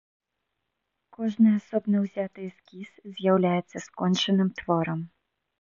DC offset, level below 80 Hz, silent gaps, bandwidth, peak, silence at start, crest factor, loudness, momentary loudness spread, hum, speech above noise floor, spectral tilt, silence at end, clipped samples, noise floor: under 0.1%; -68 dBFS; none; 7.4 kHz; -10 dBFS; 1.2 s; 18 dB; -26 LUFS; 19 LU; none; 56 dB; -6.5 dB/octave; 0.55 s; under 0.1%; -81 dBFS